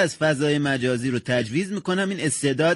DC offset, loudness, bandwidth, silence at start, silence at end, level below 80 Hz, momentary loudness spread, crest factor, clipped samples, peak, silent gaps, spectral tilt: under 0.1%; -23 LUFS; 11.5 kHz; 0 s; 0 s; -60 dBFS; 4 LU; 12 dB; under 0.1%; -10 dBFS; none; -5 dB/octave